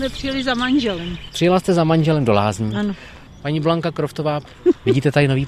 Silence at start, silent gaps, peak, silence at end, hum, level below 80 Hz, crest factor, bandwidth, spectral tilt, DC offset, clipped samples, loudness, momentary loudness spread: 0 s; none; 0 dBFS; 0 s; none; -42 dBFS; 18 dB; 14 kHz; -6.5 dB/octave; under 0.1%; under 0.1%; -19 LUFS; 9 LU